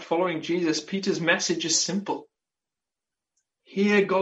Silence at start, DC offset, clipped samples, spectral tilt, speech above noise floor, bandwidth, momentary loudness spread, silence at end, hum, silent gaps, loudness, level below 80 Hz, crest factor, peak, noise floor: 0 s; under 0.1%; under 0.1%; -3.5 dB/octave; 65 dB; 8.2 kHz; 10 LU; 0 s; none; none; -25 LUFS; -72 dBFS; 20 dB; -8 dBFS; -89 dBFS